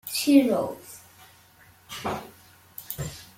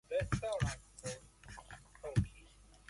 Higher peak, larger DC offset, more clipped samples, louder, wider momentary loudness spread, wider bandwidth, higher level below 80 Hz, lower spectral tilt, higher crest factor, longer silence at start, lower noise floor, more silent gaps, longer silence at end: first, -6 dBFS vs -20 dBFS; neither; neither; first, -25 LUFS vs -40 LUFS; first, 25 LU vs 18 LU; first, 16.5 kHz vs 11.5 kHz; second, -58 dBFS vs -52 dBFS; about the same, -4.5 dB/octave vs -5.5 dB/octave; about the same, 22 dB vs 20 dB; about the same, 0.05 s vs 0.1 s; second, -55 dBFS vs -61 dBFS; neither; about the same, 0.15 s vs 0.15 s